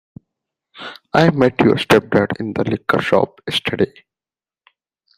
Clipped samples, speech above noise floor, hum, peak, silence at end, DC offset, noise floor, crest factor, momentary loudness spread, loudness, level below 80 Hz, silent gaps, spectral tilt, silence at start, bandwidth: under 0.1%; over 74 dB; none; 0 dBFS; 1.3 s; under 0.1%; under -90 dBFS; 18 dB; 8 LU; -17 LUFS; -52 dBFS; none; -6 dB/octave; 0.75 s; 15.5 kHz